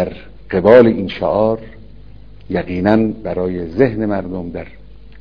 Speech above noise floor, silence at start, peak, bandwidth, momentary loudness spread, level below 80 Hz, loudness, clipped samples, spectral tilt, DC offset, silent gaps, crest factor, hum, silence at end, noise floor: 24 dB; 0 s; 0 dBFS; 5.4 kHz; 16 LU; -40 dBFS; -15 LUFS; 0.5%; -9.5 dB/octave; 1%; none; 16 dB; none; 0.5 s; -39 dBFS